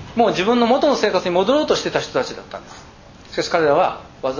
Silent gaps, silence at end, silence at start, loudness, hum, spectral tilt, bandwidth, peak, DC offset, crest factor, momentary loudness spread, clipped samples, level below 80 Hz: none; 0 s; 0 s; -18 LUFS; none; -4.5 dB/octave; 7.4 kHz; -2 dBFS; under 0.1%; 18 dB; 13 LU; under 0.1%; -50 dBFS